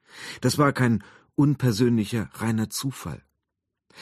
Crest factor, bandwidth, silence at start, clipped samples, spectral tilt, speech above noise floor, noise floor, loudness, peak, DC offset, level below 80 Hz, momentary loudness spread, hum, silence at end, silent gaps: 18 dB; 14 kHz; 0.15 s; under 0.1%; -6 dB/octave; 59 dB; -83 dBFS; -24 LUFS; -6 dBFS; under 0.1%; -56 dBFS; 15 LU; none; 0 s; none